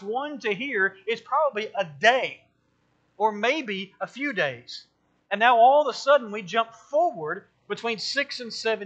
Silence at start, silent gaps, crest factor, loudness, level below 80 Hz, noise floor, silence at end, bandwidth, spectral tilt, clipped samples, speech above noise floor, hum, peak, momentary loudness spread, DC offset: 0 s; none; 22 dB; -24 LUFS; -80 dBFS; -68 dBFS; 0 s; 8.6 kHz; -3.5 dB/octave; under 0.1%; 44 dB; none; -4 dBFS; 13 LU; under 0.1%